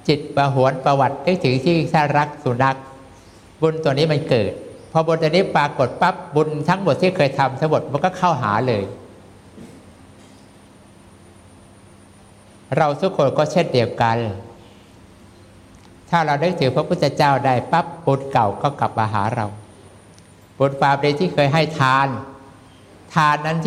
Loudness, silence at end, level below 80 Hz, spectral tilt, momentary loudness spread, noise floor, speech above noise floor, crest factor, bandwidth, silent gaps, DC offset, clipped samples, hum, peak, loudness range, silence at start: -19 LUFS; 0 s; -54 dBFS; -6.5 dB/octave; 6 LU; -46 dBFS; 28 dB; 18 dB; 12.5 kHz; none; under 0.1%; under 0.1%; none; -2 dBFS; 5 LU; 0.05 s